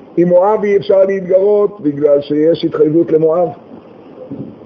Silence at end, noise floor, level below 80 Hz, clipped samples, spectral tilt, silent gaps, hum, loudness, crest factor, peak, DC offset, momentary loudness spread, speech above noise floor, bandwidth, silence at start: 0.1 s; -35 dBFS; -56 dBFS; under 0.1%; -9 dB/octave; none; none; -12 LUFS; 12 dB; 0 dBFS; under 0.1%; 7 LU; 24 dB; 6.4 kHz; 0.15 s